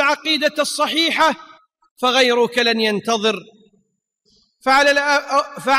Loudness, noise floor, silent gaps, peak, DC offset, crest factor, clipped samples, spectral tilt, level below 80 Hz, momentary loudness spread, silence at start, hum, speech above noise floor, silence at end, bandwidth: -17 LUFS; -68 dBFS; 1.91-1.96 s; -4 dBFS; under 0.1%; 14 dB; under 0.1%; -2 dB/octave; -60 dBFS; 7 LU; 0 s; none; 50 dB; 0 s; 16 kHz